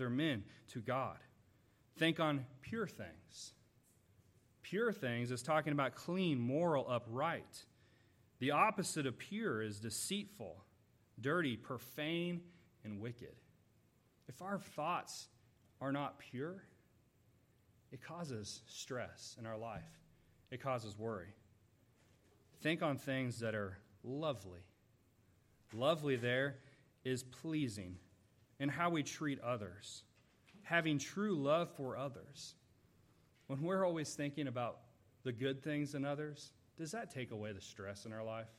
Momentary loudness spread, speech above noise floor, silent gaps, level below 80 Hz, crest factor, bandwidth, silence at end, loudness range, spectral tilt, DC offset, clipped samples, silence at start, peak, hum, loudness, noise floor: 17 LU; 32 dB; none; -80 dBFS; 24 dB; 16 kHz; 0.05 s; 9 LU; -5 dB/octave; under 0.1%; under 0.1%; 0 s; -18 dBFS; none; -41 LUFS; -73 dBFS